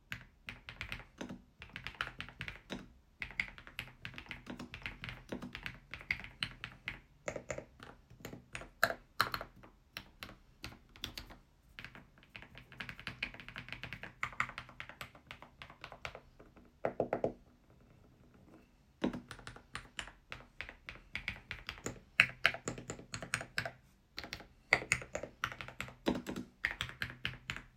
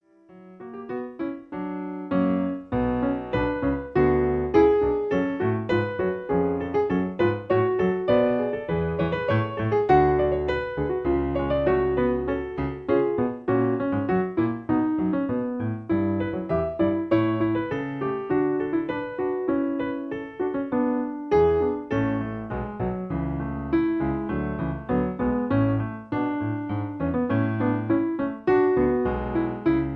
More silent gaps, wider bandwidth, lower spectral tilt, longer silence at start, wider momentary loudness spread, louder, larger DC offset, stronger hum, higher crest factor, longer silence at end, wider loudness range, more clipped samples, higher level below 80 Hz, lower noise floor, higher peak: neither; first, 16 kHz vs 6 kHz; second, -3.5 dB/octave vs -9.5 dB/octave; second, 0.1 s vs 0.3 s; first, 17 LU vs 8 LU; second, -41 LUFS vs -25 LUFS; neither; neither; first, 40 dB vs 18 dB; about the same, 0.05 s vs 0 s; first, 10 LU vs 4 LU; neither; second, -60 dBFS vs -42 dBFS; first, -64 dBFS vs -50 dBFS; about the same, -4 dBFS vs -6 dBFS